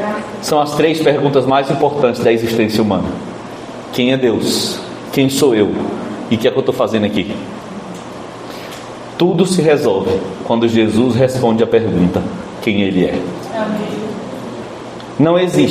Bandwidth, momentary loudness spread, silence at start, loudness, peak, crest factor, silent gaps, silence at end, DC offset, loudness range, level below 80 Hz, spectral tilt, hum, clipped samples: 15 kHz; 16 LU; 0 s; -15 LUFS; 0 dBFS; 16 dB; none; 0 s; under 0.1%; 5 LU; -50 dBFS; -5.5 dB/octave; none; under 0.1%